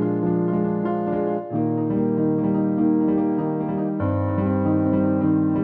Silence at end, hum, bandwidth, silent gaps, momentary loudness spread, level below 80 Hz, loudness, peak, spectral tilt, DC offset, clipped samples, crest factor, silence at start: 0 s; none; 3.4 kHz; none; 4 LU; -54 dBFS; -22 LUFS; -10 dBFS; -13 dB/octave; under 0.1%; under 0.1%; 12 dB; 0 s